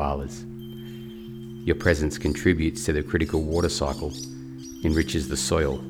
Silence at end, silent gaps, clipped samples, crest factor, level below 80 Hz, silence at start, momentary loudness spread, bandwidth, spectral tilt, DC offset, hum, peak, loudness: 0 s; none; under 0.1%; 20 dB; -36 dBFS; 0 s; 16 LU; 17 kHz; -5 dB/octave; under 0.1%; none; -6 dBFS; -25 LUFS